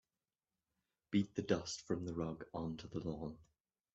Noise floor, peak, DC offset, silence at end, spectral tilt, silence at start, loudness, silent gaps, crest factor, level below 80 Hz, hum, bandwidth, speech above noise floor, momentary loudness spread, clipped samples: under -90 dBFS; -20 dBFS; under 0.1%; 0.5 s; -5.5 dB/octave; 1.1 s; -42 LUFS; none; 22 dB; -68 dBFS; none; 8.2 kHz; over 49 dB; 8 LU; under 0.1%